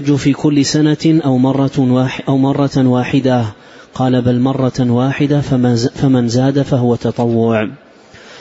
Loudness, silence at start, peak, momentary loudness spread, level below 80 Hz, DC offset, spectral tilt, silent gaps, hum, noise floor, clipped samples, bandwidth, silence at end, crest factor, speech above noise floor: -13 LUFS; 0 s; -2 dBFS; 3 LU; -44 dBFS; under 0.1%; -7 dB/octave; none; none; -39 dBFS; under 0.1%; 8 kHz; 0 s; 12 dB; 26 dB